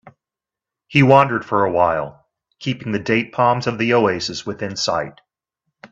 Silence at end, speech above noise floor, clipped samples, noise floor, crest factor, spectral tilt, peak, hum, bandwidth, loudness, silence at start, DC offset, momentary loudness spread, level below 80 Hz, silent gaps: 0.05 s; 70 dB; under 0.1%; -88 dBFS; 20 dB; -5.5 dB/octave; 0 dBFS; none; 8 kHz; -18 LUFS; 0.05 s; under 0.1%; 14 LU; -56 dBFS; none